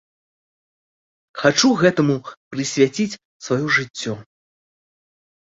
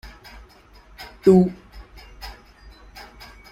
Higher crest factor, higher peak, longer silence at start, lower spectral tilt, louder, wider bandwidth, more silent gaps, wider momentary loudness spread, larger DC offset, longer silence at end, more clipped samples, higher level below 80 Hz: about the same, 20 dB vs 22 dB; about the same, -2 dBFS vs -4 dBFS; first, 1.35 s vs 1 s; second, -4.5 dB/octave vs -8.5 dB/octave; about the same, -19 LUFS vs -18 LUFS; second, 8 kHz vs 14 kHz; first, 2.37-2.51 s, 3.25-3.40 s vs none; second, 16 LU vs 28 LU; neither; about the same, 1.25 s vs 1.2 s; neither; second, -60 dBFS vs -46 dBFS